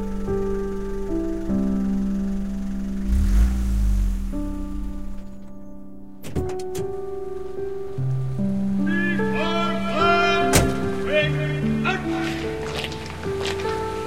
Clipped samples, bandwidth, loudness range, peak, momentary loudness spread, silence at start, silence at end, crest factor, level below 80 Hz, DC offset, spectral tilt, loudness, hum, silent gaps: under 0.1%; 16 kHz; 10 LU; -2 dBFS; 13 LU; 0 s; 0 s; 20 dB; -28 dBFS; 2%; -5.5 dB/octave; -24 LUFS; none; none